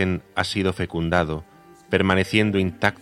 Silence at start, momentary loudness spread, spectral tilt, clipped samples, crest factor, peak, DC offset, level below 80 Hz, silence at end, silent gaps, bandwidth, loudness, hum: 0 s; 7 LU; -6 dB/octave; under 0.1%; 22 dB; 0 dBFS; under 0.1%; -50 dBFS; 0.05 s; none; 13 kHz; -22 LUFS; none